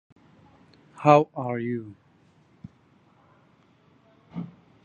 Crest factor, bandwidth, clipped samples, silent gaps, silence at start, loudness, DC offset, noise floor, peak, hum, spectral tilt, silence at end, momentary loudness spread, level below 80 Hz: 26 dB; 7.2 kHz; under 0.1%; none; 1 s; -23 LUFS; under 0.1%; -60 dBFS; -2 dBFS; none; -8 dB/octave; 0.35 s; 23 LU; -70 dBFS